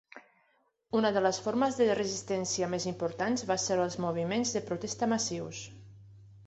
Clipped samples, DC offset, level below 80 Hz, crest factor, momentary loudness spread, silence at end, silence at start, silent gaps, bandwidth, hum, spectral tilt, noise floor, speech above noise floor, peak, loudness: under 0.1%; under 0.1%; -66 dBFS; 18 dB; 7 LU; 0 s; 0.15 s; none; 8.2 kHz; none; -4 dB/octave; -72 dBFS; 42 dB; -12 dBFS; -31 LUFS